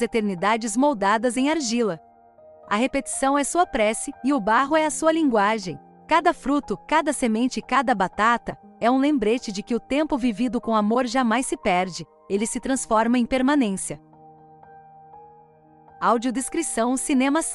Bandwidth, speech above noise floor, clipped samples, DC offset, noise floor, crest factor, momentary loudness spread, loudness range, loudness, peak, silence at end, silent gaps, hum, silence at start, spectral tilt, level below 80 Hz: 13.5 kHz; 31 dB; under 0.1%; under 0.1%; -52 dBFS; 16 dB; 6 LU; 4 LU; -22 LUFS; -8 dBFS; 0 s; none; none; 0 s; -4 dB/octave; -52 dBFS